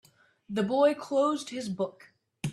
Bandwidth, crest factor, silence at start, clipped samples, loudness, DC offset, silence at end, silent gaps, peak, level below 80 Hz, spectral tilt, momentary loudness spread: 12.5 kHz; 18 dB; 0.5 s; under 0.1%; -29 LUFS; under 0.1%; 0 s; none; -12 dBFS; -70 dBFS; -5.5 dB/octave; 11 LU